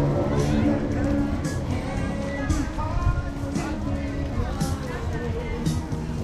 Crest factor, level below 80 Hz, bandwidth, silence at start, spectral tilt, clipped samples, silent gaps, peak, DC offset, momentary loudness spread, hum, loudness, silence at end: 14 dB; -32 dBFS; 13.5 kHz; 0 s; -7 dB/octave; under 0.1%; none; -10 dBFS; under 0.1%; 6 LU; none; -26 LUFS; 0 s